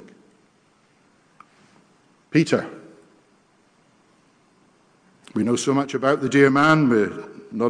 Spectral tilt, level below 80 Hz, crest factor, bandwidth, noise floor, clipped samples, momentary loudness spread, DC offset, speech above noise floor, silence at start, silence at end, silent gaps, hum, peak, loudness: -6 dB/octave; -66 dBFS; 20 dB; 10 kHz; -60 dBFS; under 0.1%; 16 LU; under 0.1%; 41 dB; 2.35 s; 0 s; none; none; -4 dBFS; -20 LUFS